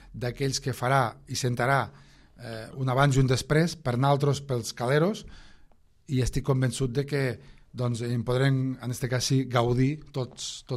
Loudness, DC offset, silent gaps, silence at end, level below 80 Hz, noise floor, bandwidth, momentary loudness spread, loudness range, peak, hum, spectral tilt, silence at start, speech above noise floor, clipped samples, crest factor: -27 LUFS; under 0.1%; none; 0 s; -46 dBFS; -56 dBFS; 14 kHz; 11 LU; 3 LU; -10 dBFS; none; -5.5 dB/octave; 0.05 s; 30 dB; under 0.1%; 18 dB